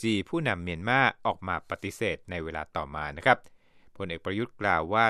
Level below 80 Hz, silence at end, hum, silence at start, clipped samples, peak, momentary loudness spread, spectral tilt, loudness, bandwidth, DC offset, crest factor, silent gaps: -54 dBFS; 0 s; none; 0 s; under 0.1%; -4 dBFS; 11 LU; -5.5 dB/octave; -29 LUFS; 14 kHz; under 0.1%; 24 dB; none